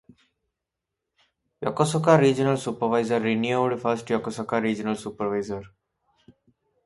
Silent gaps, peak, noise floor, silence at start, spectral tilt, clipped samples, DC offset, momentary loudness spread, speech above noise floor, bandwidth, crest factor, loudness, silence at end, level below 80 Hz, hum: none; -4 dBFS; -85 dBFS; 1.6 s; -6 dB/octave; under 0.1%; under 0.1%; 12 LU; 61 dB; 11.5 kHz; 22 dB; -24 LUFS; 1.2 s; -62 dBFS; none